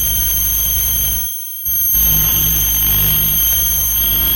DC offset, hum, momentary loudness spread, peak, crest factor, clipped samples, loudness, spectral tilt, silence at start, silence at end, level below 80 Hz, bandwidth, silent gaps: under 0.1%; none; 5 LU; -4 dBFS; 12 dB; under 0.1%; -12 LUFS; -1.5 dB/octave; 0 s; 0 s; -26 dBFS; over 20 kHz; none